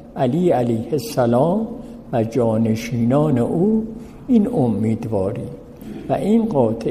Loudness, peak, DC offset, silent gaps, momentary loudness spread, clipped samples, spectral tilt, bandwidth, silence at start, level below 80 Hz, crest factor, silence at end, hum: -19 LUFS; -4 dBFS; under 0.1%; none; 14 LU; under 0.1%; -8 dB/octave; 15 kHz; 0 s; -46 dBFS; 16 dB; 0 s; none